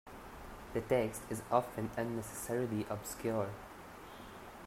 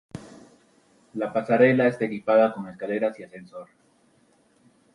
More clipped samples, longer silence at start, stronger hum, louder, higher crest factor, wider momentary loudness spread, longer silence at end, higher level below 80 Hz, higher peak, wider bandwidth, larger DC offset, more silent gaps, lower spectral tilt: neither; about the same, 0.05 s vs 0.15 s; neither; second, -37 LUFS vs -23 LUFS; about the same, 24 dB vs 20 dB; second, 17 LU vs 23 LU; second, 0 s vs 1.3 s; first, -60 dBFS vs -68 dBFS; second, -16 dBFS vs -6 dBFS; first, 16 kHz vs 11 kHz; neither; neither; second, -5.5 dB/octave vs -7.5 dB/octave